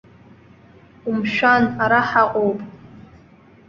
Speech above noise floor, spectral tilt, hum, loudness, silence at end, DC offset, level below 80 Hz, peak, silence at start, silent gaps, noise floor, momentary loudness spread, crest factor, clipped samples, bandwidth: 31 dB; -6.5 dB/octave; none; -18 LUFS; 0.65 s; under 0.1%; -56 dBFS; -2 dBFS; 1.05 s; none; -49 dBFS; 15 LU; 20 dB; under 0.1%; 7.2 kHz